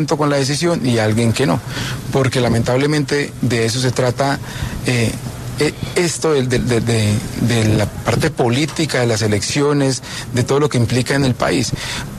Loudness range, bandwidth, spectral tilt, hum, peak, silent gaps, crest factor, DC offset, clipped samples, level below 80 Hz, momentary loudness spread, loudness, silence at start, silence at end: 2 LU; 13.5 kHz; -5 dB/octave; none; -2 dBFS; none; 14 dB; under 0.1%; under 0.1%; -38 dBFS; 5 LU; -17 LUFS; 0 s; 0 s